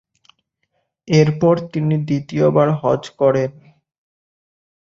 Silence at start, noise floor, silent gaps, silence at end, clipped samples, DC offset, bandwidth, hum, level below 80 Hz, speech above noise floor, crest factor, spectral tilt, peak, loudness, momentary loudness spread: 1.05 s; -70 dBFS; none; 1.4 s; under 0.1%; under 0.1%; 7.4 kHz; none; -56 dBFS; 54 dB; 18 dB; -7.5 dB/octave; -2 dBFS; -17 LUFS; 6 LU